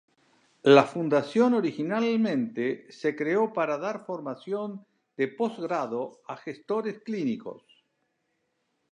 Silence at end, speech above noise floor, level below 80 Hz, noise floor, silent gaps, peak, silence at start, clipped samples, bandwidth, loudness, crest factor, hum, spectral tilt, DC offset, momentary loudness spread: 1.35 s; 50 dB; -82 dBFS; -76 dBFS; none; -4 dBFS; 0.65 s; under 0.1%; 9.8 kHz; -27 LUFS; 24 dB; none; -6.5 dB/octave; under 0.1%; 16 LU